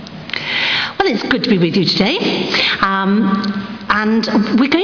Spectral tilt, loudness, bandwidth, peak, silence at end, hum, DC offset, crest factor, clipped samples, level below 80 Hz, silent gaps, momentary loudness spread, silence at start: -5.5 dB/octave; -15 LUFS; 5.4 kHz; -2 dBFS; 0 s; none; under 0.1%; 14 dB; under 0.1%; -48 dBFS; none; 5 LU; 0 s